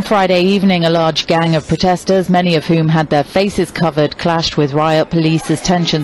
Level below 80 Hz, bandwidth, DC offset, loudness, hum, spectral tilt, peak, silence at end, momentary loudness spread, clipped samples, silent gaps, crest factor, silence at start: -40 dBFS; 12.5 kHz; under 0.1%; -13 LUFS; none; -6 dB/octave; -4 dBFS; 0 s; 3 LU; under 0.1%; none; 10 dB; 0 s